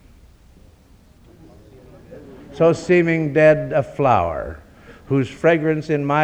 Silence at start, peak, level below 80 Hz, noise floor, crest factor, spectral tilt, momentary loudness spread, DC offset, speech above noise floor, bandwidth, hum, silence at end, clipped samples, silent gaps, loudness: 2.1 s; -2 dBFS; -46 dBFS; -50 dBFS; 18 dB; -7.5 dB/octave; 17 LU; under 0.1%; 33 dB; 9 kHz; none; 0 s; under 0.1%; none; -18 LUFS